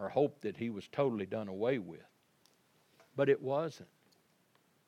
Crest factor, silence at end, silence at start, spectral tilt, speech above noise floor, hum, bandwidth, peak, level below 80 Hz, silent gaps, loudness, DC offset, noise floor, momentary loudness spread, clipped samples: 20 dB; 1.05 s; 0 s; -7.5 dB/octave; 37 dB; none; 10 kHz; -18 dBFS; -86 dBFS; none; -36 LUFS; under 0.1%; -72 dBFS; 15 LU; under 0.1%